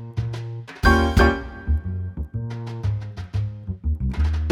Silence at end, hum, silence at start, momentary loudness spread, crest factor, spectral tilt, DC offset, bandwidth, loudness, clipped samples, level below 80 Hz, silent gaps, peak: 0 s; none; 0 s; 13 LU; 18 dB; -7 dB/octave; under 0.1%; 12.5 kHz; -24 LUFS; under 0.1%; -26 dBFS; none; -4 dBFS